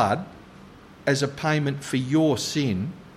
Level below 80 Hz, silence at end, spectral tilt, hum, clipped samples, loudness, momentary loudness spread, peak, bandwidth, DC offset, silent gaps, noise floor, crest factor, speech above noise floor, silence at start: -58 dBFS; 0 s; -5.5 dB/octave; none; under 0.1%; -25 LUFS; 8 LU; -6 dBFS; 15 kHz; under 0.1%; none; -47 dBFS; 18 dB; 23 dB; 0 s